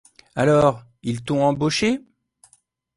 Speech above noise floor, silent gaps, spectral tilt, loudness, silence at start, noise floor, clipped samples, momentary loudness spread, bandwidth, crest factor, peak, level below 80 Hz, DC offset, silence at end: 42 dB; none; -5.5 dB/octave; -21 LUFS; 0.35 s; -61 dBFS; under 0.1%; 13 LU; 11.5 kHz; 18 dB; -4 dBFS; -52 dBFS; under 0.1%; 0.95 s